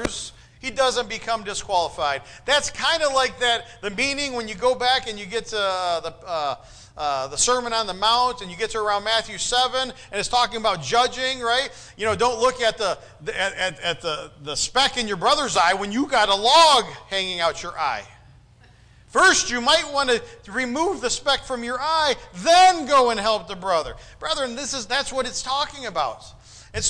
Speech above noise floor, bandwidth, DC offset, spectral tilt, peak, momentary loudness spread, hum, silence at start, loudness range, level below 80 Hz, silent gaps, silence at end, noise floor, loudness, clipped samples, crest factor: 29 dB; 10.5 kHz; under 0.1%; -1.5 dB/octave; -6 dBFS; 11 LU; none; 0 s; 5 LU; -48 dBFS; none; 0 s; -51 dBFS; -21 LUFS; under 0.1%; 16 dB